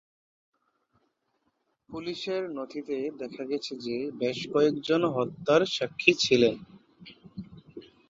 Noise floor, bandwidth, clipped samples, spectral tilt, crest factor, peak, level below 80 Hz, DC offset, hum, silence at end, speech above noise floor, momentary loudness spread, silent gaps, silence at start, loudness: -76 dBFS; 7.8 kHz; under 0.1%; -4.5 dB/octave; 26 dB; -4 dBFS; -66 dBFS; under 0.1%; none; 0.25 s; 48 dB; 21 LU; none; 1.9 s; -27 LUFS